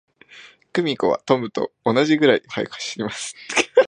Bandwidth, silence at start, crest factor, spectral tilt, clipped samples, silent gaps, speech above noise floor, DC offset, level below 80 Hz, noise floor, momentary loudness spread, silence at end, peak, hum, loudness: 11 kHz; 0.35 s; 20 dB; -4 dB/octave; under 0.1%; none; 26 dB; under 0.1%; -64 dBFS; -47 dBFS; 11 LU; 0 s; -2 dBFS; none; -21 LUFS